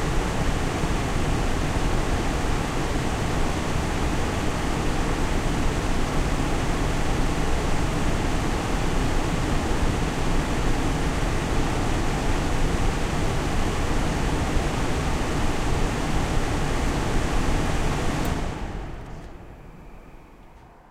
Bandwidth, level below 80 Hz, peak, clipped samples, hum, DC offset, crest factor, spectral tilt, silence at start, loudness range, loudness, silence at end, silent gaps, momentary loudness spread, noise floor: 15 kHz; -26 dBFS; -10 dBFS; under 0.1%; none; under 0.1%; 14 dB; -5 dB/octave; 0 s; 1 LU; -26 LUFS; 0.3 s; none; 1 LU; -47 dBFS